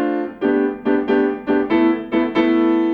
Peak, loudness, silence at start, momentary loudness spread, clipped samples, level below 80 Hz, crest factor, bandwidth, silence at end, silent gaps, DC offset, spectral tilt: -4 dBFS; -18 LUFS; 0 s; 4 LU; under 0.1%; -54 dBFS; 12 dB; 5 kHz; 0 s; none; under 0.1%; -7.5 dB/octave